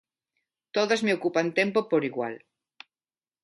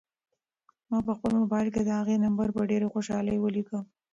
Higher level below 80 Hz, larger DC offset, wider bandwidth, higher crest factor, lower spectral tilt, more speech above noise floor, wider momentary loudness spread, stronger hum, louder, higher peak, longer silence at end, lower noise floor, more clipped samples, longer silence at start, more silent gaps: second, -78 dBFS vs -58 dBFS; neither; first, 11.5 kHz vs 7.8 kHz; first, 20 dB vs 12 dB; second, -5 dB/octave vs -7.5 dB/octave; first, over 64 dB vs 57 dB; first, 9 LU vs 6 LU; neither; about the same, -26 LUFS vs -28 LUFS; first, -8 dBFS vs -16 dBFS; first, 1.05 s vs 0.3 s; first, under -90 dBFS vs -84 dBFS; neither; second, 0.75 s vs 0.9 s; neither